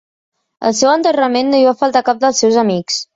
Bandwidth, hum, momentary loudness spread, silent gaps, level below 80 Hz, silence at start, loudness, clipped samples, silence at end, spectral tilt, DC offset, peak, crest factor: 7.8 kHz; none; 5 LU; none; -60 dBFS; 0.6 s; -13 LUFS; under 0.1%; 0.1 s; -3.5 dB/octave; under 0.1%; -2 dBFS; 12 dB